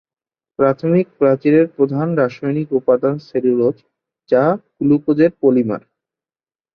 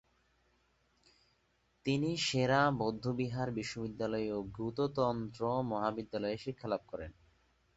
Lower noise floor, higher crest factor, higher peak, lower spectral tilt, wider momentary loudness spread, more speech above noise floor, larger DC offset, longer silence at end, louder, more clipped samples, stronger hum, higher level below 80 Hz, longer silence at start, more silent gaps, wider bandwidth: first, under -90 dBFS vs -75 dBFS; about the same, 16 dB vs 20 dB; first, -2 dBFS vs -16 dBFS; first, -10.5 dB/octave vs -5 dB/octave; second, 6 LU vs 10 LU; first, over 75 dB vs 40 dB; neither; first, 0.95 s vs 0.65 s; first, -16 LUFS vs -35 LUFS; neither; neither; about the same, -60 dBFS vs -62 dBFS; second, 0.6 s vs 1.85 s; neither; second, 6.2 kHz vs 8 kHz